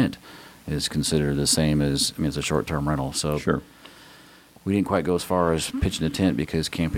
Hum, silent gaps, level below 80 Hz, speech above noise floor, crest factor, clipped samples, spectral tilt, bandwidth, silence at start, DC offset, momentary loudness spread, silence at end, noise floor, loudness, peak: none; none; -40 dBFS; 27 dB; 18 dB; under 0.1%; -4.5 dB/octave; 17 kHz; 0 s; under 0.1%; 7 LU; 0 s; -50 dBFS; -24 LUFS; -6 dBFS